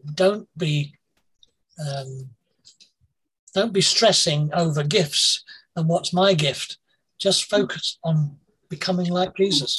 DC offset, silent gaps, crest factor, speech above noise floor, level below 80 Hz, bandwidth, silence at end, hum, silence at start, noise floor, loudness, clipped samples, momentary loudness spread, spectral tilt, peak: under 0.1%; 3.39-3.47 s; 18 dB; 47 dB; -64 dBFS; 12.5 kHz; 0 s; none; 0.05 s; -69 dBFS; -21 LUFS; under 0.1%; 15 LU; -4 dB/octave; -4 dBFS